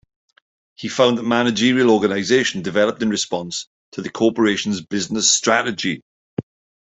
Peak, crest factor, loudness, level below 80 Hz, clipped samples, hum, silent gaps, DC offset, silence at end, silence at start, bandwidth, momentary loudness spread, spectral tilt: 0 dBFS; 18 dB; -18 LUFS; -60 dBFS; under 0.1%; none; 3.67-3.92 s, 6.02-6.37 s; under 0.1%; 0.4 s; 0.8 s; 8.4 kHz; 16 LU; -3 dB/octave